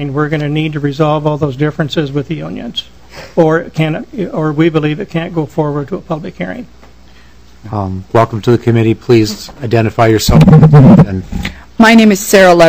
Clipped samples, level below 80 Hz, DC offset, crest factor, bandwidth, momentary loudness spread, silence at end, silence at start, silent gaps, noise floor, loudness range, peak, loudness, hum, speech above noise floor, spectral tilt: 4%; -30 dBFS; 1%; 10 dB; 16 kHz; 16 LU; 0 s; 0 s; none; -40 dBFS; 10 LU; 0 dBFS; -11 LUFS; none; 31 dB; -6.5 dB/octave